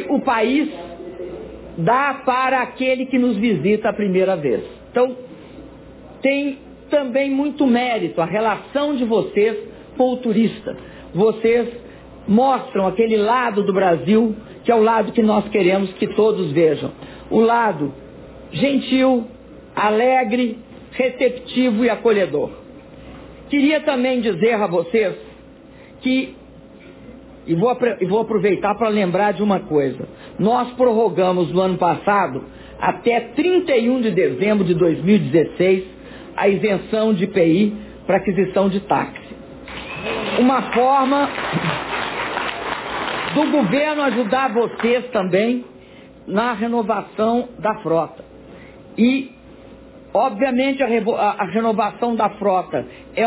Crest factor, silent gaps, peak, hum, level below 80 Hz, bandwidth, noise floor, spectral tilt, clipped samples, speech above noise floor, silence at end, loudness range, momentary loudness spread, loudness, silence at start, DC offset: 16 dB; none; -4 dBFS; none; -50 dBFS; 4 kHz; -42 dBFS; -10.5 dB/octave; under 0.1%; 25 dB; 0 s; 4 LU; 14 LU; -18 LUFS; 0 s; under 0.1%